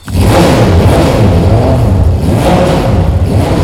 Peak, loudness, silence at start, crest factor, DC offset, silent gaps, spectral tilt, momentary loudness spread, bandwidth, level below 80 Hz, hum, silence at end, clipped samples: 0 dBFS; -8 LUFS; 0.05 s; 6 dB; under 0.1%; none; -7 dB/octave; 3 LU; 16 kHz; -16 dBFS; none; 0 s; 0.6%